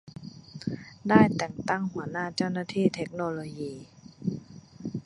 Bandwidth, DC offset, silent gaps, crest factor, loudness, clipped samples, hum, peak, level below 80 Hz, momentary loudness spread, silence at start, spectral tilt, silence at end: 11 kHz; under 0.1%; none; 24 dB; -29 LUFS; under 0.1%; none; -6 dBFS; -60 dBFS; 20 LU; 0.05 s; -6.5 dB/octave; 0.05 s